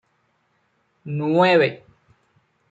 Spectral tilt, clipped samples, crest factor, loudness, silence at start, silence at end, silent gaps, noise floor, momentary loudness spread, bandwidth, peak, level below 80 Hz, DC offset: -7.5 dB/octave; under 0.1%; 18 dB; -19 LUFS; 1.05 s; 0.95 s; none; -67 dBFS; 26 LU; 7.8 kHz; -4 dBFS; -70 dBFS; under 0.1%